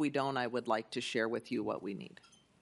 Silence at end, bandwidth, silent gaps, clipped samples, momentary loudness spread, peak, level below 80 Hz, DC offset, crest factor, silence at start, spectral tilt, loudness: 0.55 s; 11.5 kHz; none; under 0.1%; 10 LU; -18 dBFS; -80 dBFS; under 0.1%; 18 dB; 0 s; -5 dB/octave; -36 LUFS